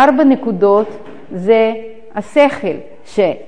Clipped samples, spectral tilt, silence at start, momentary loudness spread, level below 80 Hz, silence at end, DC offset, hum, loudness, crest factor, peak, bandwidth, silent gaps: under 0.1%; -6.5 dB/octave; 0 s; 15 LU; -54 dBFS; 0.05 s; 2%; none; -14 LUFS; 14 dB; 0 dBFS; 9.8 kHz; none